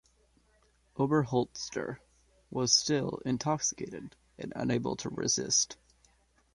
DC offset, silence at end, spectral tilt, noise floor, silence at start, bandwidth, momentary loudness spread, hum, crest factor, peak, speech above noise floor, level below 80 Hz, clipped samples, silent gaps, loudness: under 0.1%; 0.8 s; -3.5 dB/octave; -68 dBFS; 0.95 s; 11.5 kHz; 19 LU; none; 22 dB; -10 dBFS; 37 dB; -64 dBFS; under 0.1%; none; -31 LUFS